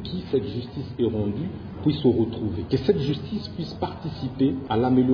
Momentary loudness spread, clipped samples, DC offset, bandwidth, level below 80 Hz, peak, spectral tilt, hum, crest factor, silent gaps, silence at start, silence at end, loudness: 10 LU; under 0.1%; under 0.1%; 5.4 kHz; -48 dBFS; -8 dBFS; -9 dB/octave; none; 16 dB; none; 0 s; 0 s; -26 LUFS